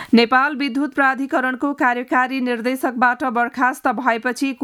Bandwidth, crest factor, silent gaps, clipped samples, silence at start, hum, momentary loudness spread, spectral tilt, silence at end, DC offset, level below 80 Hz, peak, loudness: 15 kHz; 18 dB; none; under 0.1%; 0 s; none; 5 LU; -4.5 dB/octave; 0 s; under 0.1%; -66 dBFS; -2 dBFS; -19 LUFS